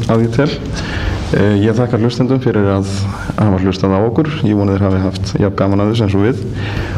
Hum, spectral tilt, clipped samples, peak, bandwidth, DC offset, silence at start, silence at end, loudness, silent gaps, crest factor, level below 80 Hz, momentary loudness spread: none; -7.5 dB/octave; under 0.1%; 0 dBFS; 10.5 kHz; under 0.1%; 0 s; 0 s; -14 LUFS; none; 12 dB; -30 dBFS; 7 LU